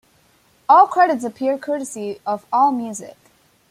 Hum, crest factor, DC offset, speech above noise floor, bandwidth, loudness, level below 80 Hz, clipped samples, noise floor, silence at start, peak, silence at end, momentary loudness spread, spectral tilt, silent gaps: none; 18 dB; under 0.1%; 39 dB; 15 kHz; -18 LUFS; -70 dBFS; under 0.1%; -57 dBFS; 0.7 s; -2 dBFS; 0.6 s; 16 LU; -4 dB/octave; none